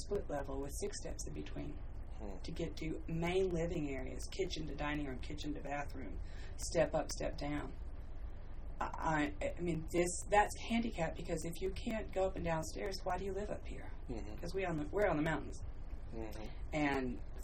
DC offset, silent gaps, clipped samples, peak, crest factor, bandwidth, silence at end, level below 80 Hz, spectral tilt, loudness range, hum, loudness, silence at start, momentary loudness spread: under 0.1%; none; under 0.1%; -18 dBFS; 20 dB; 15.5 kHz; 0 s; -46 dBFS; -5 dB/octave; 4 LU; none; -40 LUFS; 0 s; 14 LU